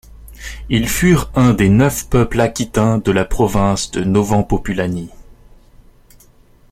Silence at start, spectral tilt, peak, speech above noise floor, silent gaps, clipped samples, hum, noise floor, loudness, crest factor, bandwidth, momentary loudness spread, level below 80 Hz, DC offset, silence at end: 0.15 s; -6 dB/octave; 0 dBFS; 33 dB; none; under 0.1%; none; -47 dBFS; -15 LUFS; 16 dB; 16.5 kHz; 10 LU; -30 dBFS; under 0.1%; 1.5 s